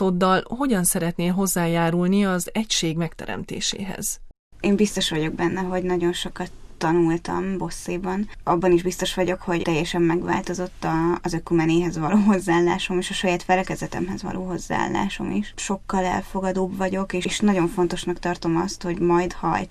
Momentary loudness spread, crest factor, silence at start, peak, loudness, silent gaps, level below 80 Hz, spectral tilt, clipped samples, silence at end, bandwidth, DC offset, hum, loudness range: 8 LU; 16 dB; 0 s; -6 dBFS; -23 LUFS; 4.39-4.51 s; -42 dBFS; -5 dB/octave; under 0.1%; 0 s; 14 kHz; under 0.1%; none; 3 LU